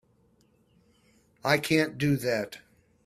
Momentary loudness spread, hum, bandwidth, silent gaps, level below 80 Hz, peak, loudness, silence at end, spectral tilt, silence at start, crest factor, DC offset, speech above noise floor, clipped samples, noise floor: 13 LU; none; 15.5 kHz; none; -64 dBFS; -8 dBFS; -27 LUFS; 0.45 s; -5.5 dB/octave; 1.45 s; 22 dB; under 0.1%; 39 dB; under 0.1%; -65 dBFS